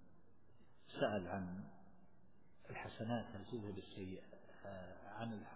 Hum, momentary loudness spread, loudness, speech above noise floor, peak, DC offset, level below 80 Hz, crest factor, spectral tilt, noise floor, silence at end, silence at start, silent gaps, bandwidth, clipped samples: none; 16 LU; -47 LUFS; 25 dB; -24 dBFS; 0.1%; -70 dBFS; 24 dB; -5.5 dB/octave; -71 dBFS; 0 s; 0 s; none; 4 kHz; under 0.1%